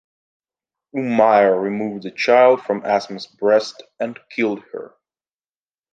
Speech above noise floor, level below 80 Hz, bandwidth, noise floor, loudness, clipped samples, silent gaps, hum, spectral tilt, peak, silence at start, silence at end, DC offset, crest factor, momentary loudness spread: over 72 dB; -68 dBFS; 7.8 kHz; under -90 dBFS; -18 LUFS; under 0.1%; none; none; -5.5 dB/octave; 0 dBFS; 0.95 s; 1.1 s; under 0.1%; 18 dB; 17 LU